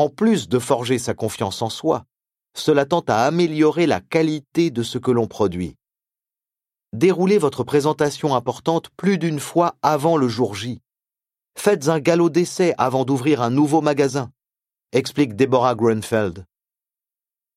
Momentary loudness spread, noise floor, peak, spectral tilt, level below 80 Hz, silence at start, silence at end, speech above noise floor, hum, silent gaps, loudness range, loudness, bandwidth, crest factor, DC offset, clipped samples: 7 LU; under -90 dBFS; 0 dBFS; -6 dB/octave; -58 dBFS; 0 s; 1.15 s; over 71 dB; none; none; 3 LU; -20 LUFS; 15 kHz; 20 dB; under 0.1%; under 0.1%